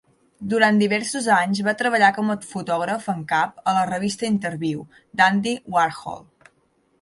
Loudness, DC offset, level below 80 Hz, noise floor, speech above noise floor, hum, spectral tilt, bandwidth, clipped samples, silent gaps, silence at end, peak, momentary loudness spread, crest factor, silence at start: -21 LUFS; under 0.1%; -64 dBFS; -64 dBFS; 43 dB; none; -4.5 dB/octave; 11.5 kHz; under 0.1%; none; 0.8 s; -2 dBFS; 11 LU; 20 dB; 0.4 s